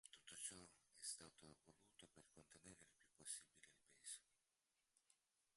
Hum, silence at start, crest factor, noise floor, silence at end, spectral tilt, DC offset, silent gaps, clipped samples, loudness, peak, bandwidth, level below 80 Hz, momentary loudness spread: none; 0.05 s; 26 dB; under -90 dBFS; 0.4 s; -0.5 dB/octave; under 0.1%; none; under 0.1%; -57 LUFS; -36 dBFS; 11.5 kHz; -90 dBFS; 15 LU